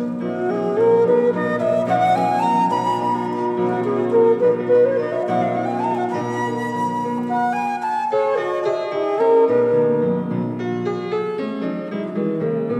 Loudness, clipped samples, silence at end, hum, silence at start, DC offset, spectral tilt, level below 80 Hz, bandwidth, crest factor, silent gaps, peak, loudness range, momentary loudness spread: -19 LUFS; under 0.1%; 0 s; none; 0 s; under 0.1%; -7.5 dB/octave; -72 dBFS; 11.5 kHz; 14 dB; none; -6 dBFS; 3 LU; 8 LU